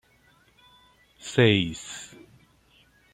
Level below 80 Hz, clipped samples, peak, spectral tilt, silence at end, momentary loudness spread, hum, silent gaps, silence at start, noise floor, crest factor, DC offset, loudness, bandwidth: -60 dBFS; under 0.1%; -6 dBFS; -5 dB/octave; 1.1 s; 22 LU; none; none; 1.25 s; -61 dBFS; 24 dB; under 0.1%; -23 LUFS; 12 kHz